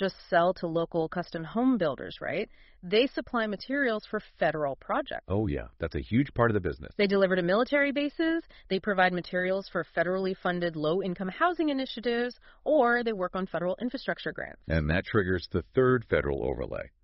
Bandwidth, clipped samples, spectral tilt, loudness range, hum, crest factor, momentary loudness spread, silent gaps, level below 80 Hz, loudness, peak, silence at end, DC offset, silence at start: 5.8 kHz; under 0.1%; -4.5 dB/octave; 3 LU; none; 20 dB; 9 LU; none; -48 dBFS; -29 LUFS; -8 dBFS; 0.15 s; under 0.1%; 0 s